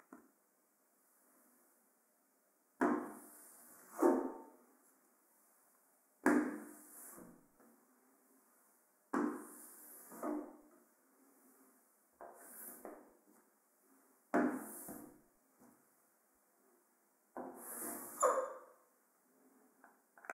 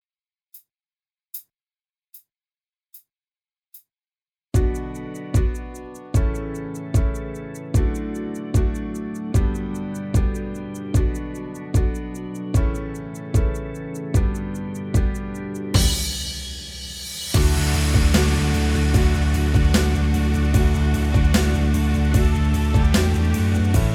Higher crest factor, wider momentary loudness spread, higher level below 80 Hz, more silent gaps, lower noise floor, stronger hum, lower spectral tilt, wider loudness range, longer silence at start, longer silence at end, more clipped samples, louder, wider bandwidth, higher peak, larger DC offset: first, 30 dB vs 18 dB; first, 23 LU vs 13 LU; second, -88 dBFS vs -24 dBFS; neither; second, -76 dBFS vs under -90 dBFS; neither; about the same, -4.5 dB/octave vs -5.5 dB/octave; first, 11 LU vs 7 LU; second, 0.1 s vs 0.55 s; about the same, 0 s vs 0 s; neither; second, -40 LUFS vs -22 LUFS; about the same, 16 kHz vs 17.5 kHz; second, -16 dBFS vs -4 dBFS; neither